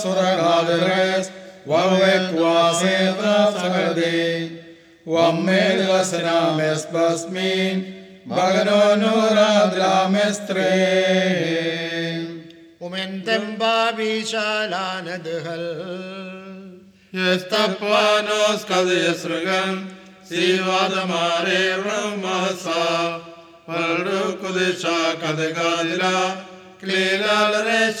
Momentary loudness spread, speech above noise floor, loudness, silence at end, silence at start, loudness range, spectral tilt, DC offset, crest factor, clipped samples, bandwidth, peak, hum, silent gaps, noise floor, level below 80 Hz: 12 LU; 24 dB; -20 LUFS; 0 s; 0 s; 5 LU; -4 dB/octave; under 0.1%; 16 dB; under 0.1%; 15.5 kHz; -4 dBFS; none; none; -43 dBFS; -74 dBFS